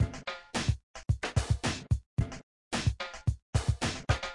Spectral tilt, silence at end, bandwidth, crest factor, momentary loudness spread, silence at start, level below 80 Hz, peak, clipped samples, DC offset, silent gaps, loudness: -5 dB/octave; 0 s; 11.5 kHz; 20 dB; 6 LU; 0 s; -40 dBFS; -12 dBFS; under 0.1%; under 0.1%; 0.83-0.94 s, 2.06-2.17 s, 2.43-2.71 s, 3.42-3.53 s; -33 LUFS